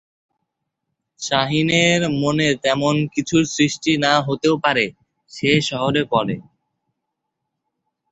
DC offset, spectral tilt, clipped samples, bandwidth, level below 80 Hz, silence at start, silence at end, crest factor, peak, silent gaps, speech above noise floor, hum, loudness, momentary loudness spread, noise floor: under 0.1%; -4.5 dB/octave; under 0.1%; 8.2 kHz; -56 dBFS; 1.2 s; 1.7 s; 18 dB; -2 dBFS; none; 60 dB; none; -18 LUFS; 5 LU; -79 dBFS